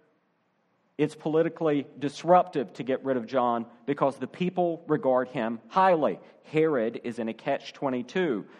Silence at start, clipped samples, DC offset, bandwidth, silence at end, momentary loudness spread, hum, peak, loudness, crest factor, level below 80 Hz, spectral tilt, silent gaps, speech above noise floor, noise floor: 1 s; under 0.1%; under 0.1%; 11 kHz; 0.15 s; 10 LU; none; -8 dBFS; -27 LUFS; 20 dB; -78 dBFS; -7 dB/octave; none; 44 dB; -71 dBFS